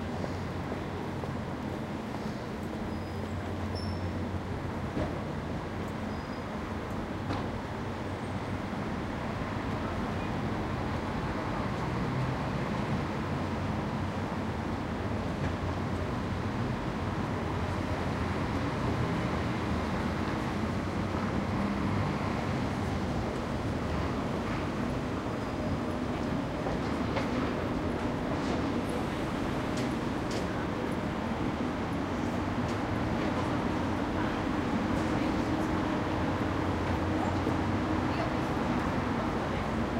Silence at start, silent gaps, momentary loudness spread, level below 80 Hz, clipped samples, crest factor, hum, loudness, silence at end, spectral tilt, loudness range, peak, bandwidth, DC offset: 0 s; none; 6 LU; -46 dBFS; under 0.1%; 16 dB; none; -33 LUFS; 0 s; -7 dB/octave; 5 LU; -16 dBFS; 16 kHz; under 0.1%